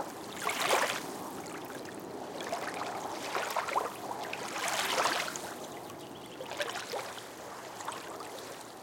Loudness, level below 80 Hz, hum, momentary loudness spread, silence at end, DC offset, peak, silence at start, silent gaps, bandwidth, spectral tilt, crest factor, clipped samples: -36 LUFS; -76 dBFS; none; 14 LU; 0 s; under 0.1%; -16 dBFS; 0 s; none; 17 kHz; -1.5 dB/octave; 22 dB; under 0.1%